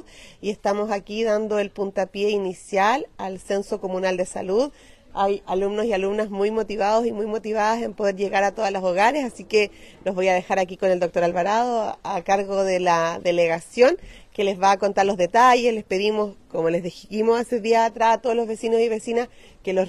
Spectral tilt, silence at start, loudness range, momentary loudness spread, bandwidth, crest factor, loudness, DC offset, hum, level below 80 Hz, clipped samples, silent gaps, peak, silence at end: -4.5 dB/octave; 0.15 s; 4 LU; 8 LU; 13 kHz; 18 dB; -22 LUFS; under 0.1%; none; -54 dBFS; under 0.1%; none; -4 dBFS; 0 s